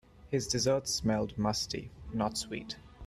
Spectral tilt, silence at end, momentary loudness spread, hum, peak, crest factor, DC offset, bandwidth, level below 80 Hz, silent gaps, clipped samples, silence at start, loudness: -4 dB/octave; 0 s; 11 LU; none; -16 dBFS; 16 dB; under 0.1%; 14.5 kHz; -54 dBFS; none; under 0.1%; 0.15 s; -33 LUFS